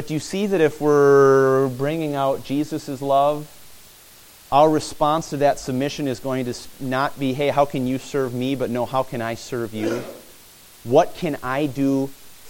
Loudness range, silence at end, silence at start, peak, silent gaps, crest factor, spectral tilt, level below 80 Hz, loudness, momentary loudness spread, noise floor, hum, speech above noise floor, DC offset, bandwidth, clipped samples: 5 LU; 0 s; 0 s; -2 dBFS; none; 18 dB; -6 dB/octave; -52 dBFS; -21 LUFS; 11 LU; -47 dBFS; none; 27 dB; under 0.1%; 17 kHz; under 0.1%